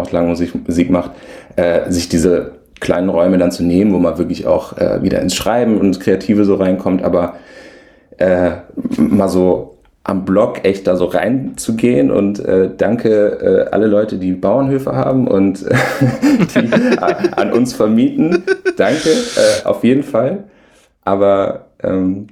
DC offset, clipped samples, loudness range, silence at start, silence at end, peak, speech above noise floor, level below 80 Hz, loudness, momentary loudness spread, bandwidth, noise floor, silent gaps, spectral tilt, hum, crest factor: under 0.1%; under 0.1%; 2 LU; 0 s; 0.05 s; 0 dBFS; 36 dB; -42 dBFS; -14 LUFS; 6 LU; 15 kHz; -49 dBFS; none; -6 dB/octave; none; 14 dB